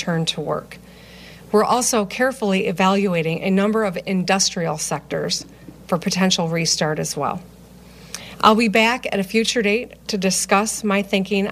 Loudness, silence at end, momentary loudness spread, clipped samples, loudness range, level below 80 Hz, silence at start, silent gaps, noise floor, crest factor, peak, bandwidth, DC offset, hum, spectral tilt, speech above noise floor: -19 LUFS; 0 s; 9 LU; under 0.1%; 3 LU; -52 dBFS; 0 s; none; -43 dBFS; 20 dB; 0 dBFS; 15.5 kHz; under 0.1%; none; -4 dB/octave; 24 dB